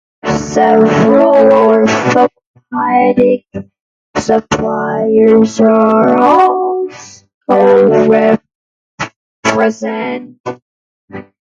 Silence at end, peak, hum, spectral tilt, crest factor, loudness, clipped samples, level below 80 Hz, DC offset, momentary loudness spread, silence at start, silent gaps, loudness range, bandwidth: 0.3 s; 0 dBFS; none; -6 dB/octave; 12 dB; -10 LUFS; under 0.1%; -46 dBFS; under 0.1%; 17 LU; 0.25 s; 2.47-2.54 s, 3.80-4.14 s, 7.34-7.41 s, 8.55-8.98 s, 9.16-9.43 s, 10.40-10.44 s, 10.62-11.08 s; 4 LU; 7.8 kHz